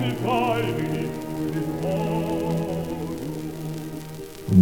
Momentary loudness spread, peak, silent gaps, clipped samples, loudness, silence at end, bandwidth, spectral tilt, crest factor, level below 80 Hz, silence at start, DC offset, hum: 11 LU; -4 dBFS; none; under 0.1%; -27 LUFS; 0 s; 20 kHz; -7 dB/octave; 20 dB; -48 dBFS; 0 s; 0.4%; none